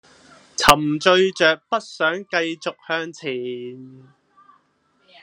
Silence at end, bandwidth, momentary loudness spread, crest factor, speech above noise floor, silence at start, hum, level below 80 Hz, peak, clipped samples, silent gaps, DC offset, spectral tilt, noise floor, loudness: 1.25 s; 13 kHz; 16 LU; 22 dB; 43 dB; 0.6 s; none; -50 dBFS; 0 dBFS; under 0.1%; none; under 0.1%; -3 dB/octave; -64 dBFS; -20 LUFS